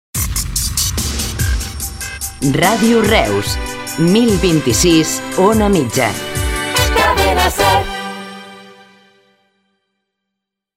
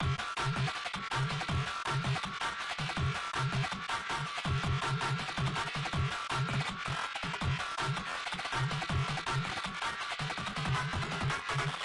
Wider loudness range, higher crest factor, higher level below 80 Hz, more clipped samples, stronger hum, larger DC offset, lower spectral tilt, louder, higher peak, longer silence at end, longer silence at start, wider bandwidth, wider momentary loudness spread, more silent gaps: first, 4 LU vs 1 LU; about the same, 16 dB vs 14 dB; first, -26 dBFS vs -52 dBFS; neither; neither; neither; about the same, -4 dB/octave vs -4.5 dB/octave; first, -14 LUFS vs -34 LUFS; first, 0 dBFS vs -20 dBFS; first, 2.05 s vs 0 s; first, 0.15 s vs 0 s; first, 16.5 kHz vs 11.5 kHz; first, 11 LU vs 3 LU; neither